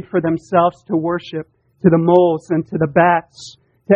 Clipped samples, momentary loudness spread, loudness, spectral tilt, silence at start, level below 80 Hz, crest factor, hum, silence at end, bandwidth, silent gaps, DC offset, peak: under 0.1%; 16 LU; -16 LUFS; -8 dB/octave; 0.15 s; -54 dBFS; 16 dB; none; 0 s; 8.4 kHz; none; under 0.1%; 0 dBFS